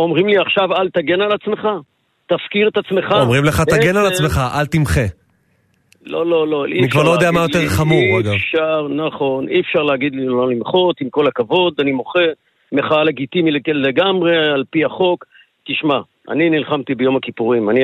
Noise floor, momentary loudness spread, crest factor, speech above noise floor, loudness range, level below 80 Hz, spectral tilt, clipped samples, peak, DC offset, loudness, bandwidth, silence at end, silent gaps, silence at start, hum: -60 dBFS; 7 LU; 14 dB; 44 dB; 2 LU; -40 dBFS; -6 dB/octave; under 0.1%; -2 dBFS; under 0.1%; -16 LUFS; 13.5 kHz; 0 s; none; 0 s; none